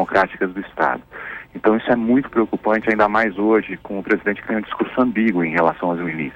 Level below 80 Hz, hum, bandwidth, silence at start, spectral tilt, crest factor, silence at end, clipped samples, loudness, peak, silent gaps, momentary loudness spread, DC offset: -52 dBFS; none; 7 kHz; 0 s; -8 dB/octave; 14 dB; 0 s; under 0.1%; -19 LUFS; -4 dBFS; none; 8 LU; under 0.1%